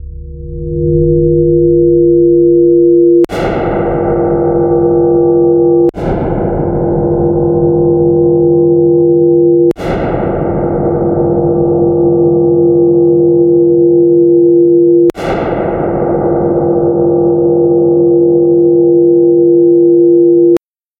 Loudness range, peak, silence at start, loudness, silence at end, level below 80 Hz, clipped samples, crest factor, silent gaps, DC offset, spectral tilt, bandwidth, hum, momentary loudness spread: 3 LU; 0 dBFS; 0 s; -9 LUFS; 0.45 s; -30 dBFS; under 0.1%; 8 dB; none; under 0.1%; -10.5 dB/octave; 3.7 kHz; none; 7 LU